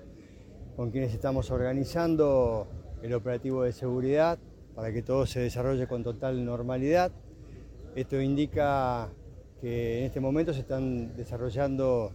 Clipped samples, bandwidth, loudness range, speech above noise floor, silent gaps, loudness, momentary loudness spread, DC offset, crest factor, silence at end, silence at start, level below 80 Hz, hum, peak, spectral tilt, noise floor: under 0.1%; 17 kHz; 2 LU; 21 dB; none; -30 LUFS; 15 LU; under 0.1%; 16 dB; 0 s; 0 s; -46 dBFS; none; -14 dBFS; -7.5 dB/octave; -49 dBFS